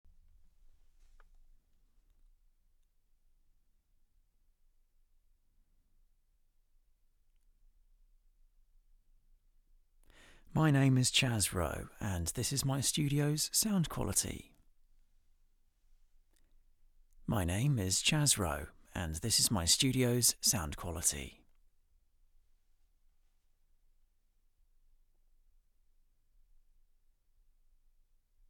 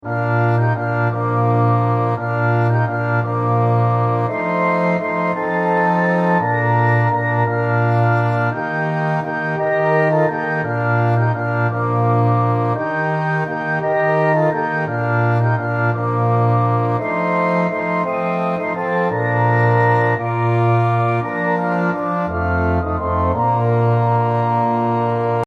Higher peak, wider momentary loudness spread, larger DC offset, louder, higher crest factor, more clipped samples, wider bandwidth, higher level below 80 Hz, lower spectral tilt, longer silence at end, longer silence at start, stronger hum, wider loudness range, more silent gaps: second, -14 dBFS vs -2 dBFS; first, 13 LU vs 4 LU; neither; second, -31 LUFS vs -17 LUFS; first, 24 dB vs 14 dB; neither; first, 19.5 kHz vs 5 kHz; second, -58 dBFS vs -44 dBFS; second, -3.5 dB/octave vs -9.5 dB/octave; first, 7.2 s vs 0 s; first, 10.5 s vs 0.05 s; neither; first, 11 LU vs 1 LU; neither